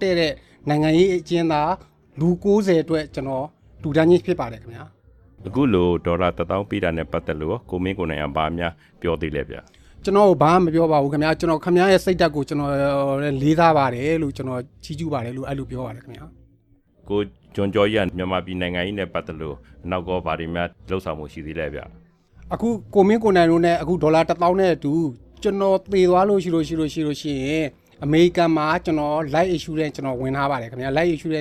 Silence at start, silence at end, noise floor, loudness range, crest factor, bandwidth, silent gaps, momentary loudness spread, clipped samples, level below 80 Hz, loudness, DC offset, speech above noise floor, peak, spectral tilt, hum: 0 s; 0 s; -58 dBFS; 8 LU; 20 dB; 13.5 kHz; none; 13 LU; under 0.1%; -44 dBFS; -21 LUFS; under 0.1%; 37 dB; -2 dBFS; -7 dB/octave; none